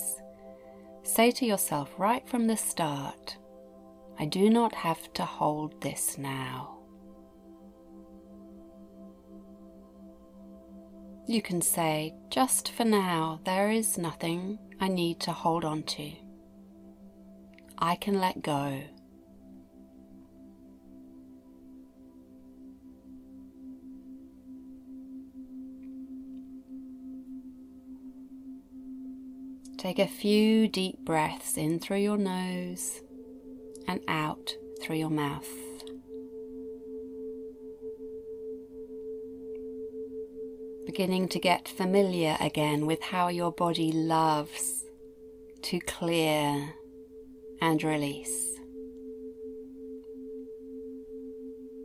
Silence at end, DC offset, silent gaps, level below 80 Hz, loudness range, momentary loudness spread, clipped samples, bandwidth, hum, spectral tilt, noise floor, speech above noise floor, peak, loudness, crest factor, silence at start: 0 s; under 0.1%; none; -64 dBFS; 19 LU; 24 LU; under 0.1%; 16 kHz; none; -4.5 dB/octave; -54 dBFS; 25 dB; -10 dBFS; -30 LUFS; 22 dB; 0 s